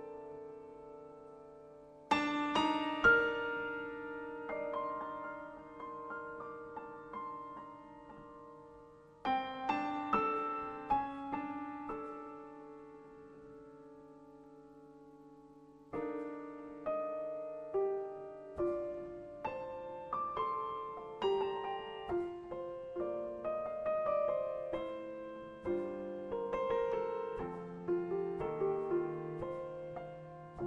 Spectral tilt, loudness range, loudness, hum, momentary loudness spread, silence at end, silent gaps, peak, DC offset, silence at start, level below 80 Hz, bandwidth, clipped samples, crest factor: -6 dB/octave; 14 LU; -38 LUFS; none; 21 LU; 0 s; none; -16 dBFS; under 0.1%; 0 s; -66 dBFS; 9.2 kHz; under 0.1%; 24 dB